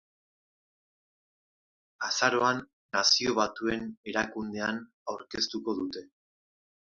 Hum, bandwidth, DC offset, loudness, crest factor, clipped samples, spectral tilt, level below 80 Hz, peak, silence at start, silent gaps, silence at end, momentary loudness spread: none; 7.6 kHz; under 0.1%; -29 LUFS; 24 dB; under 0.1%; -2 dB/octave; -66 dBFS; -8 dBFS; 2 s; 2.73-2.89 s, 3.97-4.04 s, 4.93-5.06 s; 0.8 s; 14 LU